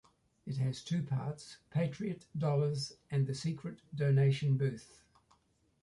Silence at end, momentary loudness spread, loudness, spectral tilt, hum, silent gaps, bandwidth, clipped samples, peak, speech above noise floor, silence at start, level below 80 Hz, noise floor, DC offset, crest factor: 1 s; 14 LU; -35 LUFS; -7 dB/octave; none; none; 11.5 kHz; under 0.1%; -20 dBFS; 39 dB; 0.45 s; -70 dBFS; -73 dBFS; under 0.1%; 14 dB